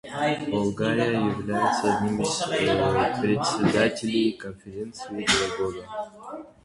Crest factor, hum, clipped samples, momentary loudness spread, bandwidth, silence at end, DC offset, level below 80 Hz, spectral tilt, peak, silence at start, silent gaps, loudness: 18 dB; none; under 0.1%; 14 LU; 11.5 kHz; 0.2 s; under 0.1%; -52 dBFS; -4.5 dB/octave; -8 dBFS; 0.05 s; none; -24 LUFS